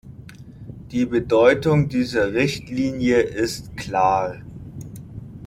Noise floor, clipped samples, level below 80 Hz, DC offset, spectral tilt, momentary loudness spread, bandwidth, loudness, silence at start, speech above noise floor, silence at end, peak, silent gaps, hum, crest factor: -41 dBFS; under 0.1%; -46 dBFS; under 0.1%; -6 dB/octave; 22 LU; 16 kHz; -20 LUFS; 0.05 s; 21 dB; 0 s; -2 dBFS; none; none; 18 dB